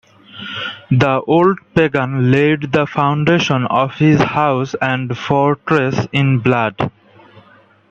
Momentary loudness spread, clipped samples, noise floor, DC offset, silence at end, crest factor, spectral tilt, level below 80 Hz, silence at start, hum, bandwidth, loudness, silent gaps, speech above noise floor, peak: 8 LU; under 0.1%; -48 dBFS; under 0.1%; 1 s; 16 dB; -7 dB/octave; -50 dBFS; 0.35 s; none; 7.4 kHz; -15 LUFS; none; 34 dB; 0 dBFS